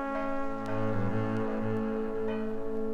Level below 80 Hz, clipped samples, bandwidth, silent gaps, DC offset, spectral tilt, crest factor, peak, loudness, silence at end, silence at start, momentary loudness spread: -44 dBFS; under 0.1%; 7 kHz; none; under 0.1%; -8.5 dB/octave; 12 dB; -18 dBFS; -33 LUFS; 0 s; 0 s; 3 LU